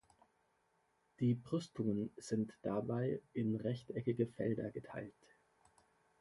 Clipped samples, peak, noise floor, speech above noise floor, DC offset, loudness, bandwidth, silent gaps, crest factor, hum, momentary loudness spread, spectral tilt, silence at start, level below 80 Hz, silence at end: under 0.1%; -22 dBFS; -78 dBFS; 39 dB; under 0.1%; -40 LUFS; 11.5 kHz; none; 20 dB; none; 7 LU; -8 dB/octave; 1.2 s; -74 dBFS; 1.1 s